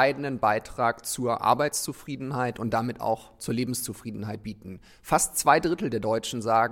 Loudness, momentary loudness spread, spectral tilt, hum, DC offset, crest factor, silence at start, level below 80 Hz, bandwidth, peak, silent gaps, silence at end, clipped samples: -27 LUFS; 13 LU; -4 dB/octave; none; under 0.1%; 22 dB; 0 s; -54 dBFS; 17 kHz; -6 dBFS; none; 0 s; under 0.1%